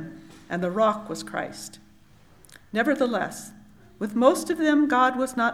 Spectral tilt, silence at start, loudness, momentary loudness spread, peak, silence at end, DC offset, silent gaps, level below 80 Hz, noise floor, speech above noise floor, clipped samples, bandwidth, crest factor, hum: -4.5 dB/octave; 0 s; -24 LUFS; 18 LU; -4 dBFS; 0 s; under 0.1%; none; -62 dBFS; -53 dBFS; 30 dB; under 0.1%; 15.5 kHz; 22 dB; none